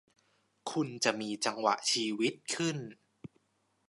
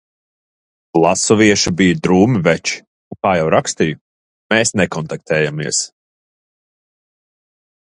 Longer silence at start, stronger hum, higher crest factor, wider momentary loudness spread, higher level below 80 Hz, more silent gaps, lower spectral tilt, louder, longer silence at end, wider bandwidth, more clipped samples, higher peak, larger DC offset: second, 0.65 s vs 0.95 s; neither; first, 24 dB vs 18 dB; first, 13 LU vs 9 LU; second, -82 dBFS vs -46 dBFS; second, none vs 2.87-3.11 s, 4.01-4.50 s; about the same, -3 dB/octave vs -4 dB/octave; second, -32 LUFS vs -15 LUFS; second, 0.95 s vs 2.05 s; about the same, 11.5 kHz vs 11.5 kHz; neither; second, -12 dBFS vs 0 dBFS; neither